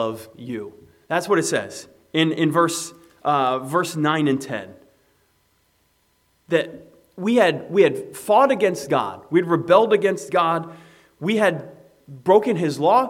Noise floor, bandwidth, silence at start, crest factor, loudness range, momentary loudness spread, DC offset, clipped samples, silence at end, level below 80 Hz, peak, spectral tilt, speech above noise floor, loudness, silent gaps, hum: -64 dBFS; 16.5 kHz; 0 s; 20 dB; 7 LU; 15 LU; under 0.1%; under 0.1%; 0 s; -70 dBFS; 0 dBFS; -5 dB/octave; 44 dB; -20 LUFS; none; none